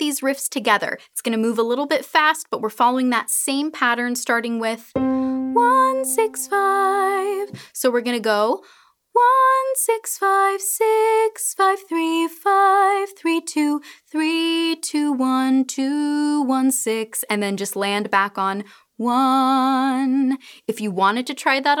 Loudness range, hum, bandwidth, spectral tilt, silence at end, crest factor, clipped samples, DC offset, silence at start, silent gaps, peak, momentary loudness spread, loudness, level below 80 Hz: 2 LU; none; 19.5 kHz; -2.5 dB/octave; 0 s; 16 dB; under 0.1%; under 0.1%; 0 s; none; -4 dBFS; 7 LU; -20 LUFS; -66 dBFS